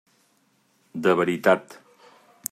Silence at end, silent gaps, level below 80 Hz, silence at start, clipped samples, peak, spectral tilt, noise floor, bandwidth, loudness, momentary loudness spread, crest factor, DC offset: 0.8 s; none; -72 dBFS; 0.95 s; under 0.1%; -4 dBFS; -5 dB/octave; -65 dBFS; 15.5 kHz; -23 LUFS; 15 LU; 22 dB; under 0.1%